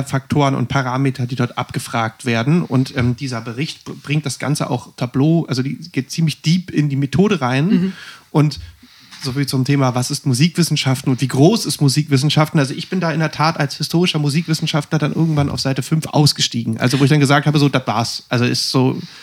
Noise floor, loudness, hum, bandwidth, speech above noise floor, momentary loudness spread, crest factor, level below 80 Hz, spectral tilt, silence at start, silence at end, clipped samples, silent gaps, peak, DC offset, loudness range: -39 dBFS; -17 LUFS; none; 15.5 kHz; 23 dB; 9 LU; 16 dB; -50 dBFS; -5.5 dB/octave; 0 s; 0 s; under 0.1%; none; 0 dBFS; under 0.1%; 4 LU